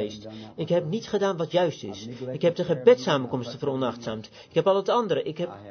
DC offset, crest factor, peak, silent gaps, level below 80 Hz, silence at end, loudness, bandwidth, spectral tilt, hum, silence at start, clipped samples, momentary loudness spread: under 0.1%; 20 dB; -6 dBFS; none; -64 dBFS; 0 s; -25 LUFS; 6.6 kHz; -6 dB/octave; none; 0 s; under 0.1%; 15 LU